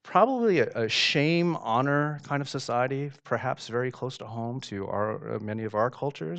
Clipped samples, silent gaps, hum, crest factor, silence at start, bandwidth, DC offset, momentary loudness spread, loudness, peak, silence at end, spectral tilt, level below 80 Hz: under 0.1%; none; none; 20 dB; 0.05 s; 9 kHz; under 0.1%; 11 LU; -28 LUFS; -8 dBFS; 0 s; -5.5 dB/octave; -68 dBFS